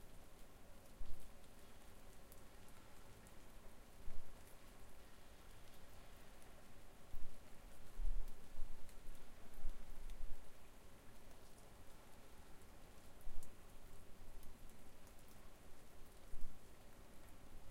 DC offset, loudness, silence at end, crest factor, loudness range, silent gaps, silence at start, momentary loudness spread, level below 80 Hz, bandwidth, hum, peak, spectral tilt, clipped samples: under 0.1%; -61 LUFS; 0 s; 16 dB; 6 LU; none; 0 s; 6 LU; -52 dBFS; 15 kHz; none; -26 dBFS; -4.5 dB/octave; under 0.1%